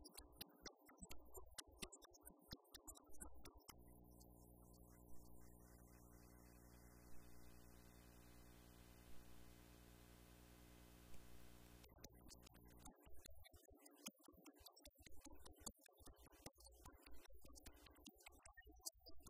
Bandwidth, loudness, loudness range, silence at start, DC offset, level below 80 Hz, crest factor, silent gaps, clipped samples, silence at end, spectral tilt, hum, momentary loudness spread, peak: 15.5 kHz; -64 LUFS; 6 LU; 0 s; under 0.1%; -70 dBFS; 28 dB; none; under 0.1%; 0 s; -3 dB/octave; none; 9 LU; -34 dBFS